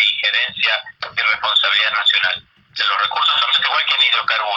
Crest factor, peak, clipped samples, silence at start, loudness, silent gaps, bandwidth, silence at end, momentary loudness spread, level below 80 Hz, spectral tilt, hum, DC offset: 14 dB; -4 dBFS; under 0.1%; 0 s; -15 LUFS; none; 7.8 kHz; 0 s; 7 LU; -64 dBFS; 0.5 dB/octave; none; under 0.1%